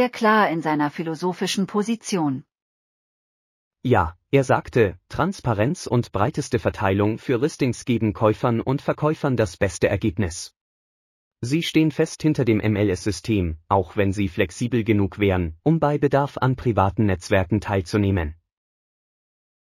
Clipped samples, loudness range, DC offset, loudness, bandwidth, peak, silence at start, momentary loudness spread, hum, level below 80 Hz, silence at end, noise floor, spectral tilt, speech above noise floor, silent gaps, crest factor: under 0.1%; 3 LU; under 0.1%; -22 LUFS; 15 kHz; -4 dBFS; 0 s; 6 LU; none; -44 dBFS; 1.3 s; under -90 dBFS; -6.5 dB/octave; over 69 dB; 2.62-3.71 s, 10.61-11.31 s; 18 dB